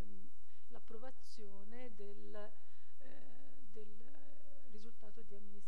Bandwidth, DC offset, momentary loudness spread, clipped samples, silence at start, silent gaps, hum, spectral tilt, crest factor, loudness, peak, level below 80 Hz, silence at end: 15 kHz; 3%; 12 LU; under 0.1%; 0 s; none; none; -7 dB/octave; 18 dB; -60 LUFS; -28 dBFS; -76 dBFS; 0 s